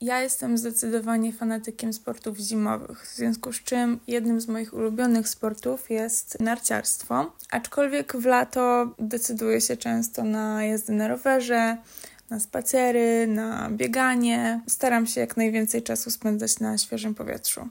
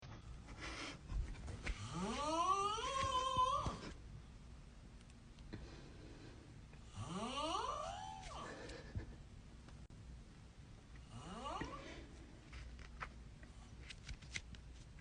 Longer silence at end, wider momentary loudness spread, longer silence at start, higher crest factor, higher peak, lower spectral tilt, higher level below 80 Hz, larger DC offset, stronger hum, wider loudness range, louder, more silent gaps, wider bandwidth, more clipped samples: about the same, 0 s vs 0 s; second, 8 LU vs 21 LU; about the same, 0 s vs 0 s; about the same, 16 dB vs 20 dB; first, -8 dBFS vs -26 dBFS; about the same, -3.5 dB/octave vs -4 dB/octave; second, -64 dBFS vs -56 dBFS; neither; neither; second, 4 LU vs 13 LU; first, -25 LUFS vs -44 LUFS; neither; first, 16.5 kHz vs 10 kHz; neither